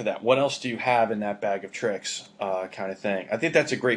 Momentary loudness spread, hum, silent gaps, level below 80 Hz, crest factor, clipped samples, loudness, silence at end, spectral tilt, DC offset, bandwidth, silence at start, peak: 8 LU; none; none; -74 dBFS; 20 dB; under 0.1%; -26 LUFS; 0 s; -4 dB/octave; under 0.1%; 10.5 kHz; 0 s; -6 dBFS